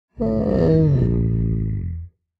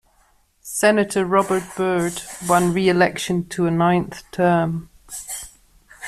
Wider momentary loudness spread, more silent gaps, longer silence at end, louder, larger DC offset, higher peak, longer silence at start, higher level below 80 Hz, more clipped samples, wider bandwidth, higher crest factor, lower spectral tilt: about the same, 12 LU vs 14 LU; neither; first, 0.3 s vs 0 s; about the same, -20 LUFS vs -20 LUFS; neither; about the same, -4 dBFS vs -2 dBFS; second, 0.2 s vs 0.65 s; first, -30 dBFS vs -52 dBFS; neither; second, 5.2 kHz vs 15 kHz; about the same, 14 dB vs 18 dB; first, -11.5 dB/octave vs -5 dB/octave